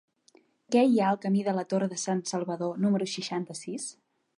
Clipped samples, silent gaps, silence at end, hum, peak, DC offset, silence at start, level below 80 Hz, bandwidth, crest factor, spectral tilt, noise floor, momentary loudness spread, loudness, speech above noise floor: under 0.1%; none; 0.45 s; none; -12 dBFS; under 0.1%; 0.7 s; -78 dBFS; 11 kHz; 18 dB; -5.5 dB/octave; -63 dBFS; 13 LU; -28 LUFS; 35 dB